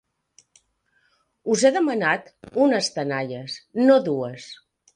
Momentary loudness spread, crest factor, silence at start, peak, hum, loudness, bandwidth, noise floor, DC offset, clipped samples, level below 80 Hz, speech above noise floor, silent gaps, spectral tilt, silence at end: 15 LU; 20 dB; 1.45 s; -4 dBFS; none; -22 LUFS; 11 kHz; -67 dBFS; under 0.1%; under 0.1%; -70 dBFS; 46 dB; none; -4.5 dB/octave; 0.4 s